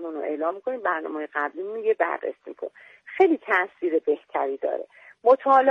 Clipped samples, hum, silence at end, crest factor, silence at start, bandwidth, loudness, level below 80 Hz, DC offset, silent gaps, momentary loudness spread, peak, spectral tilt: under 0.1%; none; 0 s; 18 dB; 0 s; 6.4 kHz; -24 LUFS; -76 dBFS; under 0.1%; none; 16 LU; -6 dBFS; -5.5 dB/octave